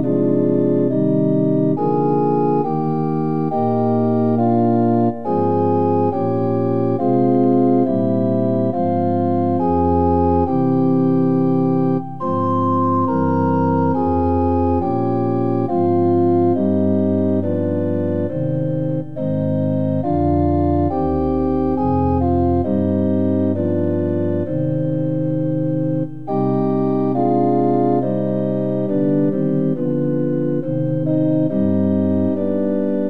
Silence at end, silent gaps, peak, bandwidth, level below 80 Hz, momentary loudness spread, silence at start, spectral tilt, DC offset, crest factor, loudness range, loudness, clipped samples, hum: 0 s; none; -4 dBFS; 5 kHz; -42 dBFS; 4 LU; 0 s; -12 dB/octave; 2%; 12 dB; 2 LU; -18 LUFS; under 0.1%; none